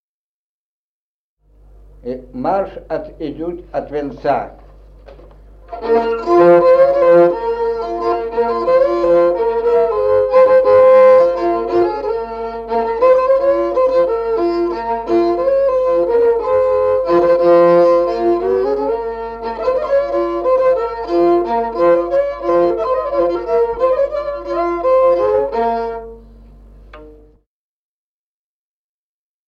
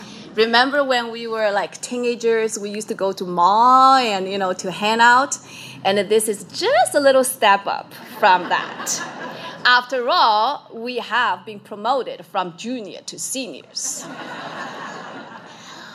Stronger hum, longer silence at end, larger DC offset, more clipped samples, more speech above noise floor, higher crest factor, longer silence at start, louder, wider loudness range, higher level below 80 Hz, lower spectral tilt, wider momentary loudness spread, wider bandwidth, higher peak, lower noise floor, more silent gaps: neither; first, 2.35 s vs 0 s; neither; neither; first, over 70 dB vs 20 dB; about the same, 14 dB vs 18 dB; first, 2.05 s vs 0 s; first, -14 LUFS vs -18 LUFS; about the same, 11 LU vs 10 LU; first, -42 dBFS vs -74 dBFS; first, -7.5 dB/octave vs -2 dB/octave; second, 13 LU vs 17 LU; second, 5.8 kHz vs 15.5 kHz; about the same, -2 dBFS vs 0 dBFS; first, under -90 dBFS vs -39 dBFS; neither